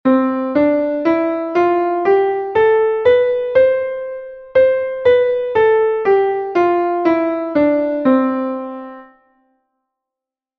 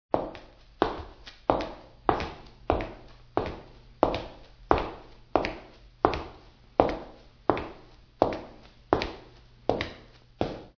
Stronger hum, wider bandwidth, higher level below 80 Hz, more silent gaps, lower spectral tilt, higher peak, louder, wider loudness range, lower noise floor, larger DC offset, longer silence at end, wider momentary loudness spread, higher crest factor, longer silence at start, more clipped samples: neither; about the same, 5.8 kHz vs 5.4 kHz; second, -54 dBFS vs -46 dBFS; neither; about the same, -7.5 dB/octave vs -7 dB/octave; about the same, -2 dBFS vs 0 dBFS; first, -15 LUFS vs -31 LUFS; about the same, 3 LU vs 2 LU; first, -86 dBFS vs -52 dBFS; neither; first, 1.55 s vs 0.1 s; second, 8 LU vs 18 LU; second, 14 dB vs 32 dB; about the same, 0.05 s vs 0.15 s; neither